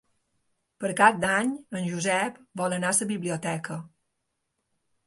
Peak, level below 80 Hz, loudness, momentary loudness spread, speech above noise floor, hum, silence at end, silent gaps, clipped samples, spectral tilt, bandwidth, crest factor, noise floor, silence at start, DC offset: -4 dBFS; -68 dBFS; -26 LUFS; 12 LU; 53 dB; none; 1.2 s; none; under 0.1%; -4 dB/octave; 12 kHz; 24 dB; -79 dBFS; 0.8 s; under 0.1%